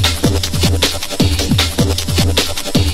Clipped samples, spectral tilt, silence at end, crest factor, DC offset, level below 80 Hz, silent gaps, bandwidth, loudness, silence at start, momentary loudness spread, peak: under 0.1%; -4 dB/octave; 0 s; 14 dB; under 0.1%; -24 dBFS; none; 16.5 kHz; -15 LUFS; 0 s; 2 LU; 0 dBFS